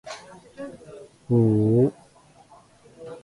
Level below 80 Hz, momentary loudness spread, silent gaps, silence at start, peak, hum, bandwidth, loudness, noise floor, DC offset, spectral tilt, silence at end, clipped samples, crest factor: -58 dBFS; 25 LU; none; 0.05 s; -8 dBFS; none; 11 kHz; -21 LUFS; -54 dBFS; under 0.1%; -9 dB/octave; 0.05 s; under 0.1%; 18 dB